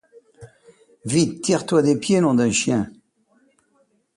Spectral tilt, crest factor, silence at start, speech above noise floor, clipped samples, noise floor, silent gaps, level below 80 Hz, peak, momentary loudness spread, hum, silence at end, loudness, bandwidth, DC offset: -5 dB/octave; 16 dB; 0.4 s; 45 dB; under 0.1%; -64 dBFS; none; -58 dBFS; -6 dBFS; 7 LU; none; 1.25 s; -19 LUFS; 11.5 kHz; under 0.1%